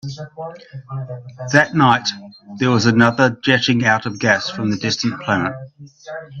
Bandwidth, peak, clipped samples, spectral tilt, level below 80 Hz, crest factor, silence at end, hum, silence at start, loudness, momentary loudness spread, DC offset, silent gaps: 8.2 kHz; 0 dBFS; under 0.1%; -5 dB/octave; -56 dBFS; 18 dB; 0 s; none; 0.05 s; -16 LUFS; 19 LU; under 0.1%; none